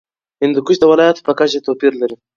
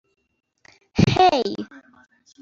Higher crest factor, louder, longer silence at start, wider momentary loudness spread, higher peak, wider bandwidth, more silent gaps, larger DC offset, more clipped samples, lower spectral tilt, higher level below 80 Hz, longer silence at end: second, 14 dB vs 20 dB; first, -14 LUFS vs -19 LUFS; second, 0.4 s vs 0.95 s; second, 7 LU vs 18 LU; about the same, 0 dBFS vs -2 dBFS; about the same, 7.4 kHz vs 7.6 kHz; neither; neither; neither; about the same, -5 dB/octave vs -6 dB/octave; second, -60 dBFS vs -46 dBFS; second, 0.2 s vs 0.65 s